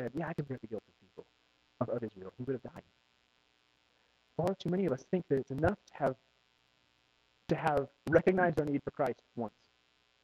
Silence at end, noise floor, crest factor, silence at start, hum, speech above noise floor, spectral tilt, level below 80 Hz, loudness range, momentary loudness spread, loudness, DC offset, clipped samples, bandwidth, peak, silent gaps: 0.75 s; -72 dBFS; 24 dB; 0 s; none; 39 dB; -8 dB/octave; -62 dBFS; 10 LU; 15 LU; -35 LUFS; under 0.1%; under 0.1%; 13.5 kHz; -12 dBFS; none